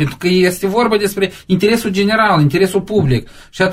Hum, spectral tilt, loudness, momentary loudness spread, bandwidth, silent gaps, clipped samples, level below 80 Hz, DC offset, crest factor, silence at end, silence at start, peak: none; -6 dB/octave; -14 LUFS; 6 LU; 16 kHz; none; under 0.1%; -40 dBFS; under 0.1%; 12 dB; 0 s; 0 s; -2 dBFS